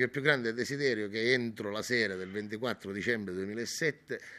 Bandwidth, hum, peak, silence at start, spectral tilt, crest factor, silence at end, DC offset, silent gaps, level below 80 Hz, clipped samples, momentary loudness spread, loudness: 15 kHz; none; -8 dBFS; 0 s; -4 dB/octave; 24 dB; 0 s; under 0.1%; none; -74 dBFS; under 0.1%; 8 LU; -32 LUFS